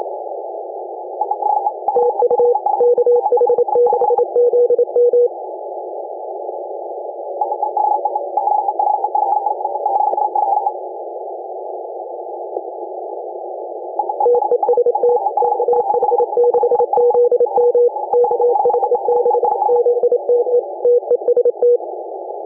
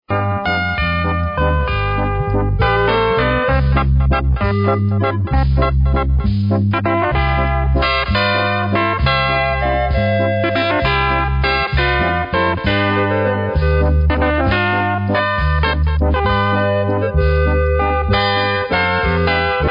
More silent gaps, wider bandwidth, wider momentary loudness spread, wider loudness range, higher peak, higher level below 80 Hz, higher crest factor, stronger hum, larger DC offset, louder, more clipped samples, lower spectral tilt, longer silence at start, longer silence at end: neither; second, 1.5 kHz vs 5.4 kHz; first, 14 LU vs 2 LU; first, 7 LU vs 1 LU; second, -6 dBFS vs -2 dBFS; second, -74 dBFS vs -22 dBFS; about the same, 10 dB vs 14 dB; neither; neither; about the same, -16 LUFS vs -16 LUFS; neither; first, -11 dB/octave vs -9 dB/octave; about the same, 0 s vs 0.1 s; about the same, 0 s vs 0 s